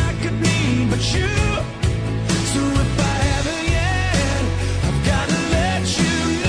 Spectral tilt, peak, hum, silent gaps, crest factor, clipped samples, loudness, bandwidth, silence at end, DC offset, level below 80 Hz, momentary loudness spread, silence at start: -5 dB/octave; -6 dBFS; none; none; 14 dB; under 0.1%; -19 LUFS; 10.5 kHz; 0 s; under 0.1%; -28 dBFS; 3 LU; 0 s